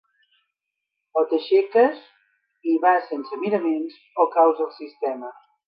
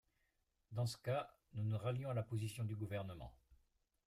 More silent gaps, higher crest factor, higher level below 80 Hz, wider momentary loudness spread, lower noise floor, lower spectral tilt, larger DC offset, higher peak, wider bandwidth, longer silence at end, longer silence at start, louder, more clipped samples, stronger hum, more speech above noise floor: neither; about the same, 18 dB vs 16 dB; second, -84 dBFS vs -70 dBFS; first, 13 LU vs 10 LU; about the same, -82 dBFS vs -84 dBFS; first, -8.5 dB/octave vs -6.5 dB/octave; neither; first, -6 dBFS vs -30 dBFS; second, 5.4 kHz vs 15 kHz; second, 0.35 s vs 0.5 s; first, 1.15 s vs 0.7 s; first, -22 LUFS vs -44 LUFS; neither; neither; first, 61 dB vs 41 dB